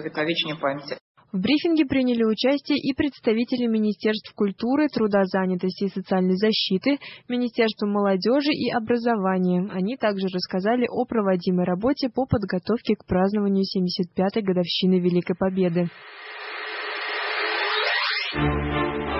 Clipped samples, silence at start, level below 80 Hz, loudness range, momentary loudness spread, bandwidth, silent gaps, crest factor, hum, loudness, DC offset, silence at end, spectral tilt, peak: under 0.1%; 0 s; -46 dBFS; 2 LU; 6 LU; 6 kHz; 1.01-1.15 s; 16 dB; none; -23 LUFS; under 0.1%; 0 s; -8.5 dB/octave; -8 dBFS